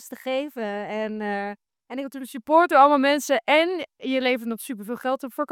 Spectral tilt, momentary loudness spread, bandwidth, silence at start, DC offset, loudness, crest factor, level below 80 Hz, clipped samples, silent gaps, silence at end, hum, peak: -3.5 dB/octave; 17 LU; 18 kHz; 0 s; under 0.1%; -23 LUFS; 20 dB; -76 dBFS; under 0.1%; none; 0 s; none; -4 dBFS